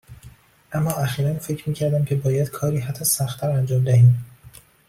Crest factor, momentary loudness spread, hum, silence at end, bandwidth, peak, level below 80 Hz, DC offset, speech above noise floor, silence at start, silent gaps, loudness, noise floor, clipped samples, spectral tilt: 16 dB; 11 LU; none; 0.4 s; 16 kHz; -6 dBFS; -52 dBFS; under 0.1%; 28 dB; 0.1 s; none; -21 LUFS; -48 dBFS; under 0.1%; -6 dB/octave